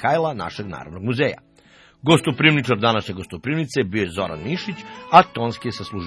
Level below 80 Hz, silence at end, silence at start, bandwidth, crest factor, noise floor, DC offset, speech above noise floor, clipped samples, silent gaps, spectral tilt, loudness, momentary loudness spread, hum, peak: -54 dBFS; 0 s; 0 s; 11 kHz; 20 dB; -52 dBFS; under 0.1%; 31 dB; under 0.1%; none; -5.5 dB/octave; -20 LUFS; 16 LU; none; 0 dBFS